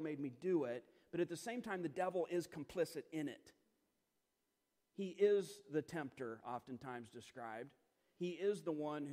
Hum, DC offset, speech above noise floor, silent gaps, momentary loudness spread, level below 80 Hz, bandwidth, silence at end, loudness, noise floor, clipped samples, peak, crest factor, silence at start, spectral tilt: none; under 0.1%; 44 dB; none; 12 LU; -84 dBFS; 15.5 kHz; 0 s; -43 LUFS; -87 dBFS; under 0.1%; -24 dBFS; 20 dB; 0 s; -6 dB/octave